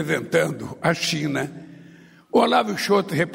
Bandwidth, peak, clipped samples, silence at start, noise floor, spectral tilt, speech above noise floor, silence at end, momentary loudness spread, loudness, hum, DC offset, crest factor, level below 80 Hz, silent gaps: 16 kHz; -6 dBFS; under 0.1%; 0 s; -48 dBFS; -4.5 dB/octave; 27 dB; 0 s; 9 LU; -22 LUFS; none; under 0.1%; 18 dB; -62 dBFS; none